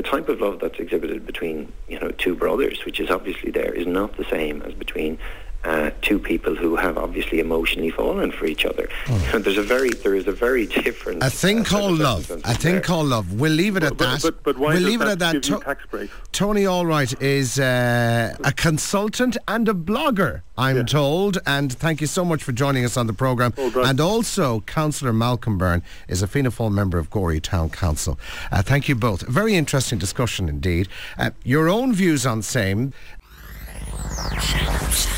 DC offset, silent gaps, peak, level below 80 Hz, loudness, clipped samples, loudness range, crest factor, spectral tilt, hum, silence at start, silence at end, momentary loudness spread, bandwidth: 1%; none; -8 dBFS; -34 dBFS; -21 LUFS; under 0.1%; 4 LU; 14 dB; -5 dB/octave; none; 0 s; 0 s; 8 LU; 16.5 kHz